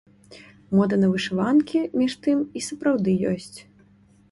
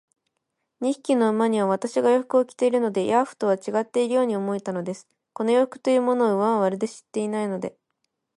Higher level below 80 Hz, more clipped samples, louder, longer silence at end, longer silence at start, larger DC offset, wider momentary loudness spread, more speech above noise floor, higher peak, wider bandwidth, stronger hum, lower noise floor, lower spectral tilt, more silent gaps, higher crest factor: first, -60 dBFS vs -74 dBFS; neither; about the same, -23 LUFS vs -23 LUFS; about the same, 0.7 s vs 0.65 s; second, 0.3 s vs 0.8 s; neither; about the same, 7 LU vs 9 LU; second, 34 dB vs 56 dB; about the same, -8 dBFS vs -8 dBFS; about the same, 11.5 kHz vs 11.5 kHz; neither; second, -56 dBFS vs -79 dBFS; about the same, -6.5 dB/octave vs -6 dB/octave; neither; about the same, 16 dB vs 16 dB